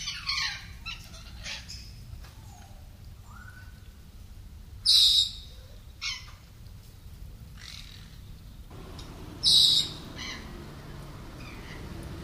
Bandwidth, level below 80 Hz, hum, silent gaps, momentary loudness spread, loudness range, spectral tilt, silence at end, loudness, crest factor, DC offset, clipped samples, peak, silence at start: 16 kHz; -48 dBFS; none; none; 30 LU; 18 LU; -1 dB/octave; 0 s; -23 LUFS; 26 dB; under 0.1%; under 0.1%; -6 dBFS; 0 s